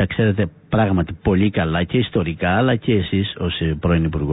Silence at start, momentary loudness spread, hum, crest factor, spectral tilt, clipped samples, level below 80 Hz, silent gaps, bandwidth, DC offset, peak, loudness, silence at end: 0 s; 4 LU; none; 12 dB; -12 dB/octave; under 0.1%; -32 dBFS; none; 4 kHz; under 0.1%; -6 dBFS; -19 LUFS; 0 s